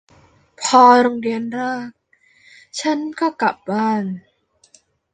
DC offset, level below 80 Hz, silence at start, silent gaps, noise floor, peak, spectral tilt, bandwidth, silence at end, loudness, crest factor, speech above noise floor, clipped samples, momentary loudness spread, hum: under 0.1%; -66 dBFS; 0.6 s; none; -55 dBFS; -2 dBFS; -4 dB/octave; 9.6 kHz; 0.95 s; -17 LUFS; 18 dB; 38 dB; under 0.1%; 18 LU; none